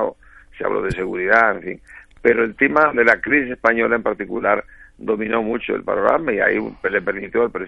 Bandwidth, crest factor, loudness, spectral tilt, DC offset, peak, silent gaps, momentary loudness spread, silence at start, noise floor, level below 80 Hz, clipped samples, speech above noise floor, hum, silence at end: 8.2 kHz; 18 dB; -18 LUFS; -7 dB/octave; under 0.1%; 0 dBFS; none; 9 LU; 0 s; -44 dBFS; -46 dBFS; under 0.1%; 25 dB; none; 0 s